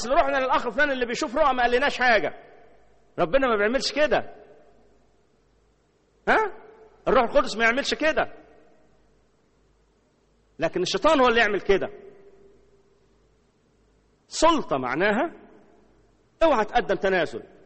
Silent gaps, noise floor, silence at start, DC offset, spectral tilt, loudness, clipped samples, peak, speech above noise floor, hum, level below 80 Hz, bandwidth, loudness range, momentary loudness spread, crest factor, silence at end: none; -64 dBFS; 0 s; under 0.1%; -3.5 dB/octave; -23 LUFS; under 0.1%; -6 dBFS; 42 dB; none; -46 dBFS; 8.4 kHz; 5 LU; 10 LU; 20 dB; 0.2 s